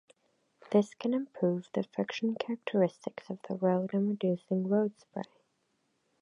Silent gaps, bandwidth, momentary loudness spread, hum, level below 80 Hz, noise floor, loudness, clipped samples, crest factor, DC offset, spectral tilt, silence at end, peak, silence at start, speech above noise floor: none; 10 kHz; 13 LU; none; -82 dBFS; -77 dBFS; -32 LUFS; under 0.1%; 20 dB; under 0.1%; -7.5 dB/octave; 0.95 s; -12 dBFS; 0.7 s; 45 dB